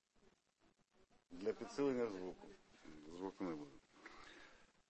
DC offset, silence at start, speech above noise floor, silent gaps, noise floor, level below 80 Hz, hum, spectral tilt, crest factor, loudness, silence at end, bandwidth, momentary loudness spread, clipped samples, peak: under 0.1%; 0.65 s; 33 dB; none; -78 dBFS; -76 dBFS; none; -6 dB/octave; 20 dB; -45 LUFS; 0.2 s; 8.4 kHz; 21 LU; under 0.1%; -28 dBFS